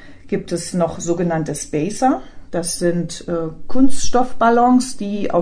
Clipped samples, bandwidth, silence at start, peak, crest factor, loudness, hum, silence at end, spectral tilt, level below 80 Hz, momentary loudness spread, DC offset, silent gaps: under 0.1%; 10.5 kHz; 0 s; -2 dBFS; 12 dB; -19 LUFS; none; 0 s; -5.5 dB/octave; -38 dBFS; 10 LU; under 0.1%; none